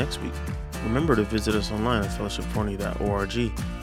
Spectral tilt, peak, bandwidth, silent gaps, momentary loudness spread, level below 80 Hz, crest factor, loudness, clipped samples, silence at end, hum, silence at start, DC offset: -6 dB/octave; -6 dBFS; 16.5 kHz; none; 8 LU; -34 dBFS; 20 dB; -27 LUFS; under 0.1%; 0 s; none; 0 s; under 0.1%